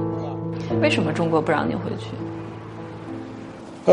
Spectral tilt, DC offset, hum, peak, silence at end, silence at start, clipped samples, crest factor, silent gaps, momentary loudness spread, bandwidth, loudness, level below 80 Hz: -6.5 dB/octave; under 0.1%; none; -2 dBFS; 0 s; 0 s; under 0.1%; 22 dB; none; 16 LU; 10.5 kHz; -24 LUFS; -54 dBFS